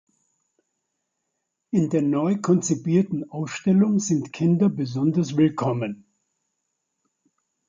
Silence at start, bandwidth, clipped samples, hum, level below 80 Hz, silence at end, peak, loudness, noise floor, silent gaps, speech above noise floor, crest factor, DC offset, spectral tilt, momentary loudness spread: 1.75 s; 9.2 kHz; under 0.1%; none; -66 dBFS; 1.75 s; -8 dBFS; -23 LUFS; -79 dBFS; none; 58 dB; 16 dB; under 0.1%; -7 dB/octave; 8 LU